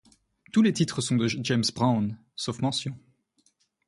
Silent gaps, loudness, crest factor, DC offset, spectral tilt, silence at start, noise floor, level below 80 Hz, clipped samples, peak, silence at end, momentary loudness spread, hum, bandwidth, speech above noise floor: none; -26 LUFS; 18 dB; under 0.1%; -5 dB/octave; 0.55 s; -69 dBFS; -62 dBFS; under 0.1%; -10 dBFS; 0.9 s; 10 LU; none; 11.5 kHz; 43 dB